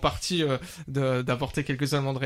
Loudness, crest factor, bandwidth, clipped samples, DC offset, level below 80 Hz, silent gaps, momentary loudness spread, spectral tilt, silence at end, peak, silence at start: -28 LUFS; 18 dB; 15 kHz; under 0.1%; under 0.1%; -46 dBFS; none; 4 LU; -5.5 dB/octave; 0 s; -10 dBFS; 0 s